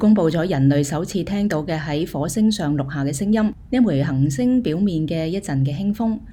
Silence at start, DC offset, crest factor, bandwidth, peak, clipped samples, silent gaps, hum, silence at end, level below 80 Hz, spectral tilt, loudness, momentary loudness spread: 0 s; under 0.1%; 14 dB; 16 kHz; -6 dBFS; under 0.1%; none; none; 0 s; -44 dBFS; -6.5 dB/octave; -20 LUFS; 6 LU